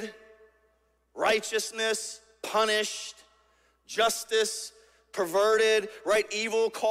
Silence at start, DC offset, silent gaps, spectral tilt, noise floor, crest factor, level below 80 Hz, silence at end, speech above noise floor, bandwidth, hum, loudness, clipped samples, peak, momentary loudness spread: 0 s; under 0.1%; none; -1 dB/octave; -69 dBFS; 18 dB; -70 dBFS; 0 s; 42 dB; 16 kHz; none; -27 LUFS; under 0.1%; -12 dBFS; 15 LU